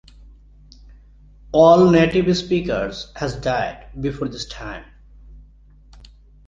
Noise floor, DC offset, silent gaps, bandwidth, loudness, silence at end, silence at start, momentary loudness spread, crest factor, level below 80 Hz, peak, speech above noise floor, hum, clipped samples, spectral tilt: -48 dBFS; under 0.1%; none; 7.8 kHz; -18 LUFS; 1.05 s; 1.5 s; 18 LU; 18 dB; -42 dBFS; -2 dBFS; 30 dB; 50 Hz at -45 dBFS; under 0.1%; -6.5 dB/octave